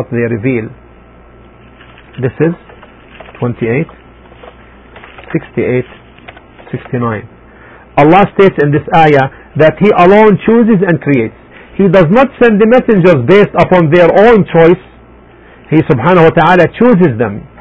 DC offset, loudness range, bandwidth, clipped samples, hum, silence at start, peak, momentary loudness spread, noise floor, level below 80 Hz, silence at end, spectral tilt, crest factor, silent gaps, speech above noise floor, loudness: under 0.1%; 12 LU; 8 kHz; 0.9%; none; 0 s; 0 dBFS; 13 LU; -38 dBFS; -38 dBFS; 0.15 s; -9 dB/octave; 10 dB; none; 30 dB; -9 LUFS